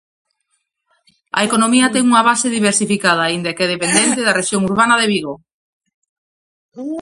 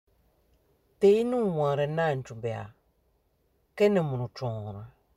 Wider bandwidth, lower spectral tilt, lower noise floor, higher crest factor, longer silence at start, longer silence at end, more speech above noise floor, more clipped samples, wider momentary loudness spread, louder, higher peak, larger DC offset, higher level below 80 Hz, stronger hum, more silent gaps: about the same, 11.5 kHz vs 12 kHz; second, -3 dB/octave vs -7.5 dB/octave; about the same, -69 dBFS vs -70 dBFS; about the same, 16 dB vs 18 dB; first, 1.35 s vs 1 s; second, 0 s vs 0.3 s; first, 54 dB vs 44 dB; neither; second, 9 LU vs 18 LU; first, -14 LUFS vs -27 LUFS; first, 0 dBFS vs -12 dBFS; neither; first, -58 dBFS vs -64 dBFS; neither; first, 5.53-5.80 s, 5.94-6.02 s, 6.09-6.69 s vs none